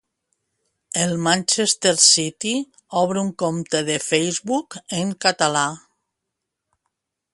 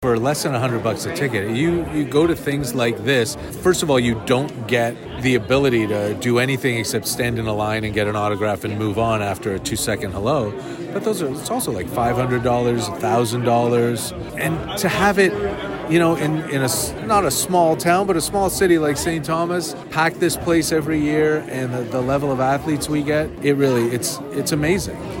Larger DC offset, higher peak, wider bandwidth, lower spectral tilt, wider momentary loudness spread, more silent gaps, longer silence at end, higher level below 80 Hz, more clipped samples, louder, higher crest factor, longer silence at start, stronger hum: neither; first, 0 dBFS vs -4 dBFS; second, 11.5 kHz vs 16.5 kHz; second, -2.5 dB/octave vs -5 dB/octave; first, 12 LU vs 6 LU; neither; first, 1.55 s vs 0 s; second, -64 dBFS vs -42 dBFS; neither; about the same, -19 LUFS vs -20 LUFS; first, 22 dB vs 16 dB; first, 0.95 s vs 0 s; neither